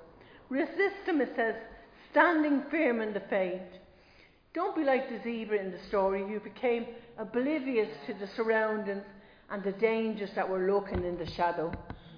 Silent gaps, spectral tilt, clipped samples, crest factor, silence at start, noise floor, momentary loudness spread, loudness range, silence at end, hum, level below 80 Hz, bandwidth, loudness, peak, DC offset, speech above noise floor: none; -8 dB/octave; under 0.1%; 22 dB; 0 s; -60 dBFS; 12 LU; 3 LU; 0 s; none; -58 dBFS; 5.2 kHz; -31 LUFS; -10 dBFS; under 0.1%; 29 dB